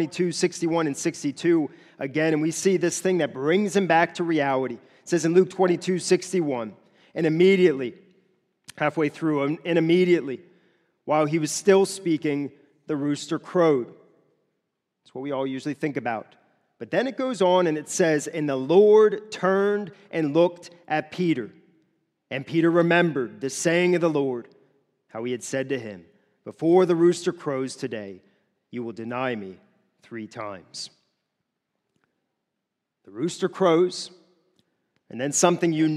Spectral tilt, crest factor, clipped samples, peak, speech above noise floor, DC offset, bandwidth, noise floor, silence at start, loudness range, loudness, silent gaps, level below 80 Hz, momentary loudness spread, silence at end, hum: -5 dB/octave; 22 dB; under 0.1%; -2 dBFS; 59 dB; under 0.1%; 13 kHz; -82 dBFS; 0 s; 11 LU; -23 LUFS; none; -78 dBFS; 16 LU; 0 s; none